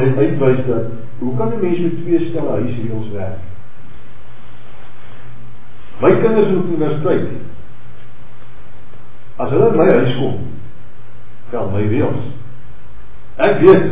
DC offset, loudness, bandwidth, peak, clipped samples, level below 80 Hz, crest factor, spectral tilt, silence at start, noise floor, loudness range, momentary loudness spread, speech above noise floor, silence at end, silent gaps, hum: 10%; -16 LUFS; 4 kHz; 0 dBFS; under 0.1%; -44 dBFS; 18 dB; -11.5 dB/octave; 0 s; -42 dBFS; 7 LU; 19 LU; 27 dB; 0 s; none; none